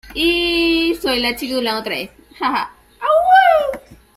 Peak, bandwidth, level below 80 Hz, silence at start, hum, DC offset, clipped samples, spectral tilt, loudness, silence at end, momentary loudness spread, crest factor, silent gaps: -2 dBFS; 16 kHz; -44 dBFS; 0.05 s; none; under 0.1%; under 0.1%; -3 dB/octave; -16 LUFS; 0.25 s; 14 LU; 16 dB; none